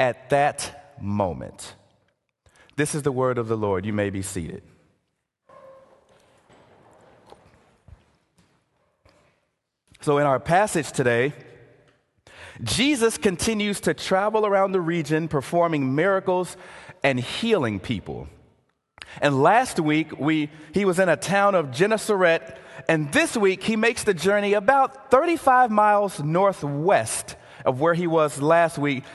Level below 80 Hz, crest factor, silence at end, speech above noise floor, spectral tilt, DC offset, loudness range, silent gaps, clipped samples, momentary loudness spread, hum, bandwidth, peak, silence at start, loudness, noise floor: -54 dBFS; 20 dB; 0 s; 54 dB; -5 dB/octave; under 0.1%; 7 LU; none; under 0.1%; 12 LU; none; 12.5 kHz; -2 dBFS; 0 s; -22 LUFS; -76 dBFS